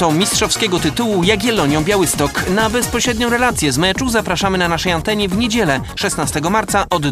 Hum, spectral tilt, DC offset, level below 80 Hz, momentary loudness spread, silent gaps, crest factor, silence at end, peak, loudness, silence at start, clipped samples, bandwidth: none; -3.5 dB/octave; under 0.1%; -34 dBFS; 3 LU; none; 16 dB; 0 s; 0 dBFS; -15 LUFS; 0 s; under 0.1%; 15.5 kHz